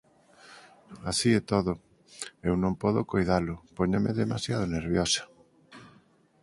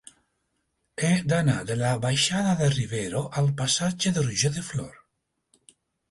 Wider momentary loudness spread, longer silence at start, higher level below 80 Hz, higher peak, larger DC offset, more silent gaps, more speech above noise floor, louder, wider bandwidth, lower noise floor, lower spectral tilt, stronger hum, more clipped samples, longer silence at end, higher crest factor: about the same, 10 LU vs 8 LU; second, 0.5 s vs 1 s; first, -48 dBFS vs -56 dBFS; about the same, -10 dBFS vs -10 dBFS; neither; neither; second, 34 dB vs 52 dB; second, -28 LUFS vs -25 LUFS; about the same, 11.5 kHz vs 11.5 kHz; second, -61 dBFS vs -77 dBFS; about the same, -5 dB/octave vs -4.5 dB/octave; neither; neither; second, 0.55 s vs 1.2 s; about the same, 20 dB vs 16 dB